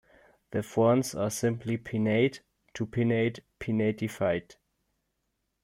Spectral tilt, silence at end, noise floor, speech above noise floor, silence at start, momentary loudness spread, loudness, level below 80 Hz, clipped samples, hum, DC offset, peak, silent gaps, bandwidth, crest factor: -6 dB/octave; 1.2 s; -80 dBFS; 52 dB; 0.5 s; 11 LU; -29 LUFS; -62 dBFS; under 0.1%; none; under 0.1%; -12 dBFS; none; 16 kHz; 18 dB